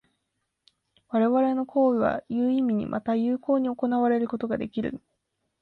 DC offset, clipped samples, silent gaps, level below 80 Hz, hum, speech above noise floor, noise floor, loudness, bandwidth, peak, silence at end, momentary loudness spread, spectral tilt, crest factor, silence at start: under 0.1%; under 0.1%; none; -62 dBFS; none; 55 dB; -79 dBFS; -25 LUFS; 4.5 kHz; -12 dBFS; 0.65 s; 7 LU; -9.5 dB/octave; 14 dB; 1.1 s